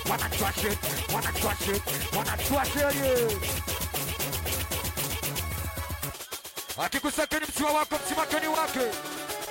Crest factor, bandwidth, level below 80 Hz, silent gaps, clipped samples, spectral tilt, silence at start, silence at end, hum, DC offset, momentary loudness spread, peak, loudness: 16 dB; 16.5 kHz; -42 dBFS; none; under 0.1%; -3 dB/octave; 0 s; 0 s; none; under 0.1%; 8 LU; -14 dBFS; -28 LUFS